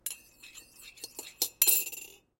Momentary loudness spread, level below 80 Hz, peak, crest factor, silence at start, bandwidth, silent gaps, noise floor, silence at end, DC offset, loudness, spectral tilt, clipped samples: 26 LU; -72 dBFS; -6 dBFS; 28 dB; 0.05 s; 17 kHz; none; -53 dBFS; 0.3 s; under 0.1%; -27 LUFS; 2 dB/octave; under 0.1%